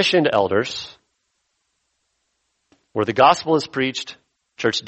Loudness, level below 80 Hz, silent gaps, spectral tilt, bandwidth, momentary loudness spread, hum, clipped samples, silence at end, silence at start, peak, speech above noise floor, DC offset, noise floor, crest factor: -19 LUFS; -62 dBFS; none; -4.5 dB/octave; 8.4 kHz; 16 LU; none; under 0.1%; 0 s; 0 s; -2 dBFS; 53 dB; under 0.1%; -72 dBFS; 20 dB